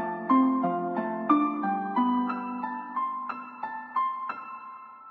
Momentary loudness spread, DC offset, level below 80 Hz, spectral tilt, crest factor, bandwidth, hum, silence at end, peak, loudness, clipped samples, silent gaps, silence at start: 13 LU; under 0.1%; -88 dBFS; -9 dB/octave; 18 dB; 4.5 kHz; none; 0 s; -10 dBFS; -28 LUFS; under 0.1%; none; 0 s